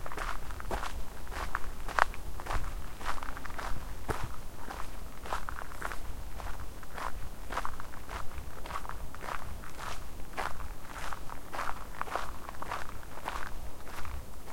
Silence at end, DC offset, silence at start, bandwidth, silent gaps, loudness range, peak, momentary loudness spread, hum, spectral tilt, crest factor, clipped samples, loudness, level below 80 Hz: 0 s; 2%; 0 s; 16.5 kHz; none; 5 LU; -2 dBFS; 7 LU; none; -4 dB/octave; 32 dB; under 0.1%; -40 LUFS; -42 dBFS